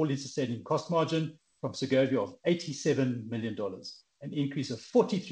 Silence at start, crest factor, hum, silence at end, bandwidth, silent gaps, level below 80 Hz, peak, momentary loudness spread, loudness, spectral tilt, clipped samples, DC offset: 0 s; 18 dB; none; 0 s; 9.8 kHz; none; -72 dBFS; -12 dBFS; 11 LU; -31 LUFS; -6 dB/octave; under 0.1%; under 0.1%